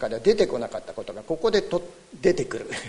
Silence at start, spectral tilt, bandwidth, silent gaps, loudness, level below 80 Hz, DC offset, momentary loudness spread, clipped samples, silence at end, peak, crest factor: 0 s; -5 dB/octave; 11 kHz; none; -25 LUFS; -50 dBFS; under 0.1%; 14 LU; under 0.1%; 0 s; -4 dBFS; 20 dB